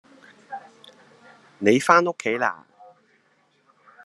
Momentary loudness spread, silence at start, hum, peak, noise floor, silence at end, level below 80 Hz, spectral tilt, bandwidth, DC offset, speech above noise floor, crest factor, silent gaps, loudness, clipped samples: 23 LU; 0.5 s; none; 0 dBFS; -64 dBFS; 1.5 s; -74 dBFS; -4.5 dB/octave; 12.5 kHz; under 0.1%; 44 dB; 26 dB; none; -20 LUFS; under 0.1%